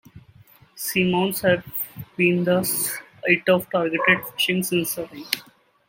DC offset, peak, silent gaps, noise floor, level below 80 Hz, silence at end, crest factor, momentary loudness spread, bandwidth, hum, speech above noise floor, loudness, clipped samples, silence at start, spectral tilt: under 0.1%; 0 dBFS; none; -52 dBFS; -60 dBFS; 0.5 s; 24 dB; 10 LU; 17 kHz; none; 30 dB; -22 LUFS; under 0.1%; 0.15 s; -4 dB/octave